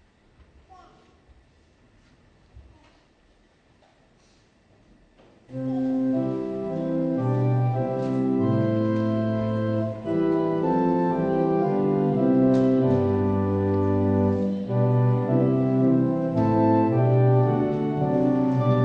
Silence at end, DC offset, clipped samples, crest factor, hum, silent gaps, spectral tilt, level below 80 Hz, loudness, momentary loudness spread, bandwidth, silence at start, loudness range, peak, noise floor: 0 s; under 0.1%; under 0.1%; 14 dB; none; none; -10.5 dB/octave; -56 dBFS; -23 LUFS; 6 LU; 6 kHz; 2.55 s; 8 LU; -8 dBFS; -60 dBFS